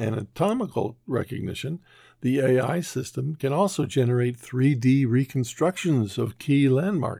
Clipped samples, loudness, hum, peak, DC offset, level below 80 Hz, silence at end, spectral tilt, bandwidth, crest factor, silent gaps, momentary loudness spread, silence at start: under 0.1%; -25 LUFS; none; -10 dBFS; under 0.1%; -64 dBFS; 0 s; -7 dB/octave; 15.5 kHz; 14 dB; none; 10 LU; 0 s